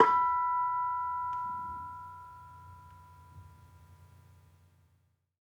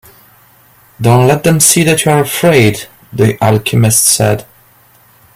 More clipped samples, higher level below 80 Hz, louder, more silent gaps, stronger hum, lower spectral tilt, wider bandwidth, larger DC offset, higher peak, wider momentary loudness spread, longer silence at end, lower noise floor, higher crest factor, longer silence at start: second, under 0.1% vs 0.1%; second, -68 dBFS vs -44 dBFS; second, -32 LUFS vs -9 LUFS; neither; neither; about the same, -5.5 dB/octave vs -4.5 dB/octave; second, 7.8 kHz vs over 20 kHz; neither; second, -6 dBFS vs 0 dBFS; first, 26 LU vs 8 LU; first, 1.4 s vs 0.95 s; first, -72 dBFS vs -46 dBFS; first, 28 dB vs 12 dB; second, 0 s vs 1 s